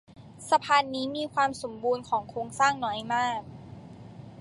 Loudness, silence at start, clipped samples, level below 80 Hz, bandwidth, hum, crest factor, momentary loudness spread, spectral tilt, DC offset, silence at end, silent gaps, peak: -28 LUFS; 0.15 s; under 0.1%; -62 dBFS; 11.5 kHz; none; 20 dB; 22 LU; -3.5 dB/octave; under 0.1%; 0 s; none; -8 dBFS